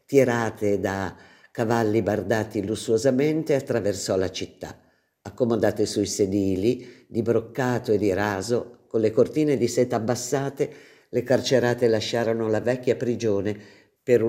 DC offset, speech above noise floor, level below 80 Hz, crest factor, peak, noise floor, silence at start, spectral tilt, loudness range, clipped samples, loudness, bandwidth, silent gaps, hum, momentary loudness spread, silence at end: under 0.1%; 21 dB; -62 dBFS; 18 dB; -6 dBFS; -44 dBFS; 0.1 s; -5.5 dB/octave; 2 LU; under 0.1%; -24 LUFS; 16 kHz; none; none; 9 LU; 0 s